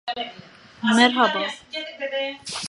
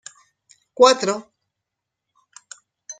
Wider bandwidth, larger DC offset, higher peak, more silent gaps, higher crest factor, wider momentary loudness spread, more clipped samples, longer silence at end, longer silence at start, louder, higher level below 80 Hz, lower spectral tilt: first, 11.5 kHz vs 9.4 kHz; neither; about the same, 0 dBFS vs -2 dBFS; neither; about the same, 24 dB vs 22 dB; second, 15 LU vs 26 LU; neither; about the same, 0 s vs 0.1 s; second, 0.05 s vs 0.8 s; second, -22 LUFS vs -17 LUFS; about the same, -68 dBFS vs -70 dBFS; about the same, -3 dB/octave vs -2.5 dB/octave